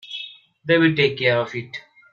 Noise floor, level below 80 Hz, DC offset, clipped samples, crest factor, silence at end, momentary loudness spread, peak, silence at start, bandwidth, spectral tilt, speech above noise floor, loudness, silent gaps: -39 dBFS; -64 dBFS; under 0.1%; under 0.1%; 18 dB; 0.35 s; 19 LU; -4 dBFS; 0.05 s; 7 kHz; -7 dB/octave; 20 dB; -19 LUFS; none